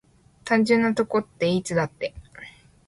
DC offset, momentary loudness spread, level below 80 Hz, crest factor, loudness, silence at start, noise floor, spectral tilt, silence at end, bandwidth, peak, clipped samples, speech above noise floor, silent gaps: under 0.1%; 23 LU; -56 dBFS; 16 dB; -23 LUFS; 0.45 s; -46 dBFS; -5.5 dB/octave; 0.35 s; 11.5 kHz; -8 dBFS; under 0.1%; 24 dB; none